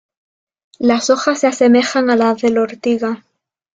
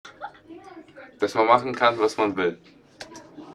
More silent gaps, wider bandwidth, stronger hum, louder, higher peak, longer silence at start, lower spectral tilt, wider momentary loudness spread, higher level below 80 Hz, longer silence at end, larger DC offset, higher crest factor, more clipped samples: neither; second, 9 kHz vs 12 kHz; neither; first, -15 LUFS vs -22 LUFS; about the same, -2 dBFS vs -2 dBFS; first, 0.8 s vs 0.05 s; about the same, -4 dB/octave vs -4.5 dB/octave; second, 7 LU vs 24 LU; first, -60 dBFS vs -66 dBFS; first, 0.6 s vs 0 s; neither; second, 14 dB vs 24 dB; neither